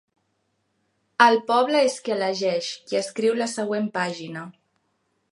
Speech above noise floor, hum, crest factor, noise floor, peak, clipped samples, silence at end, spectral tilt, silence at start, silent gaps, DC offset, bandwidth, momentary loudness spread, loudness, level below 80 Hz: 50 dB; none; 22 dB; -72 dBFS; -2 dBFS; under 0.1%; 0.8 s; -3.5 dB/octave; 1.2 s; none; under 0.1%; 11.5 kHz; 17 LU; -22 LUFS; -80 dBFS